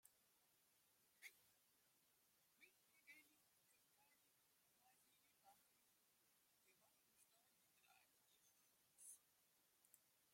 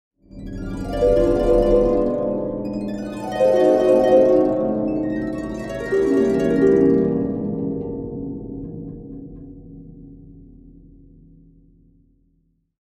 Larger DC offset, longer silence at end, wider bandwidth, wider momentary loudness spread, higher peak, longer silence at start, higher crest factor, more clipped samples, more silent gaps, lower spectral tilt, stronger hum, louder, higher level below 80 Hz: neither; second, 0 s vs 2.4 s; first, 16.5 kHz vs 11 kHz; second, 5 LU vs 20 LU; second, -48 dBFS vs -2 dBFS; second, 0 s vs 0.35 s; first, 28 dB vs 18 dB; neither; neither; second, 0 dB/octave vs -8 dB/octave; neither; second, -66 LUFS vs -19 LUFS; second, under -90 dBFS vs -36 dBFS